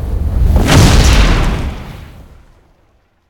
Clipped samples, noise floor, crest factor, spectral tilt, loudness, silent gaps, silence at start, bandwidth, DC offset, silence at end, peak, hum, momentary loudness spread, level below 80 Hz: 0.4%; -54 dBFS; 12 dB; -5 dB/octave; -11 LUFS; none; 0 s; 18 kHz; under 0.1%; 1.1 s; 0 dBFS; none; 21 LU; -14 dBFS